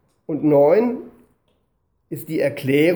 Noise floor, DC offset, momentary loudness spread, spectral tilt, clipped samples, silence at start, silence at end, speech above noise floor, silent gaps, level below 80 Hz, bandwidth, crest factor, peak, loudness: -68 dBFS; under 0.1%; 18 LU; -7 dB/octave; under 0.1%; 0.3 s; 0 s; 51 dB; none; -64 dBFS; over 20 kHz; 16 dB; -4 dBFS; -19 LUFS